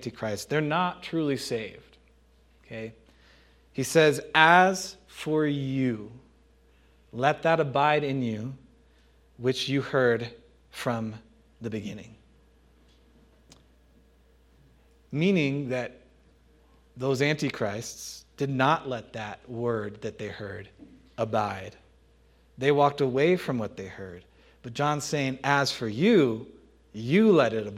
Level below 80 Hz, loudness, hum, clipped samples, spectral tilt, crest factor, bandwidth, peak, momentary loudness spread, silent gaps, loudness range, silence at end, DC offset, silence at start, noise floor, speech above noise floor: -62 dBFS; -26 LUFS; none; under 0.1%; -5.5 dB/octave; 26 dB; 16 kHz; -2 dBFS; 19 LU; none; 10 LU; 0 s; under 0.1%; 0 s; -60 dBFS; 34 dB